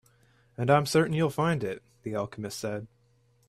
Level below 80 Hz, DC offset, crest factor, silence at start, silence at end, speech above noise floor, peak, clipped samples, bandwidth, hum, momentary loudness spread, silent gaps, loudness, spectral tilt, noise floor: -64 dBFS; under 0.1%; 20 dB; 0.6 s; 0.65 s; 38 dB; -10 dBFS; under 0.1%; 14.5 kHz; none; 14 LU; none; -28 LUFS; -6 dB/octave; -66 dBFS